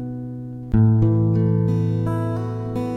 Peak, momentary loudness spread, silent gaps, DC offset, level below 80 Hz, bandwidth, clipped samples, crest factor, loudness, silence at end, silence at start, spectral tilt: -6 dBFS; 14 LU; none; under 0.1%; -38 dBFS; 3.9 kHz; under 0.1%; 14 dB; -20 LUFS; 0 s; 0 s; -10.5 dB/octave